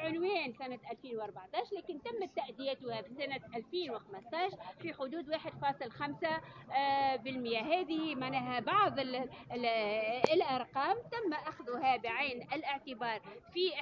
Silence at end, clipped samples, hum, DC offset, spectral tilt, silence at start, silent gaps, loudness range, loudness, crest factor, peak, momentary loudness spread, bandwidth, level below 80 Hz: 0 s; under 0.1%; none; under 0.1%; -2 dB/octave; 0 s; none; 7 LU; -37 LUFS; 28 dB; -8 dBFS; 11 LU; 7.2 kHz; -74 dBFS